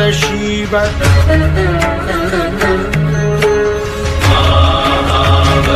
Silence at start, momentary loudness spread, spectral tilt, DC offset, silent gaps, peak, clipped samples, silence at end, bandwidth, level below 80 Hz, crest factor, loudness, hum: 0 s; 5 LU; -5.5 dB/octave; under 0.1%; none; 0 dBFS; under 0.1%; 0 s; 15 kHz; -20 dBFS; 12 dB; -12 LUFS; none